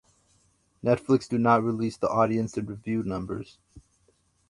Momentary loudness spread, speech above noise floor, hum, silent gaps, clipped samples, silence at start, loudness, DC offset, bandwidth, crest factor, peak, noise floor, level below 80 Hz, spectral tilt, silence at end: 12 LU; 41 dB; none; none; under 0.1%; 0.85 s; -26 LUFS; under 0.1%; 11.5 kHz; 20 dB; -6 dBFS; -67 dBFS; -56 dBFS; -7.5 dB/octave; 0.7 s